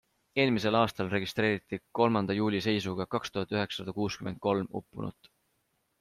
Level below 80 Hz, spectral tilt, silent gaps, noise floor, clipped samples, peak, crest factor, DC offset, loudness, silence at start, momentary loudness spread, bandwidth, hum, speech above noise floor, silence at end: -64 dBFS; -6 dB/octave; none; -76 dBFS; under 0.1%; -10 dBFS; 20 dB; under 0.1%; -30 LUFS; 0.35 s; 11 LU; 15 kHz; none; 46 dB; 0.9 s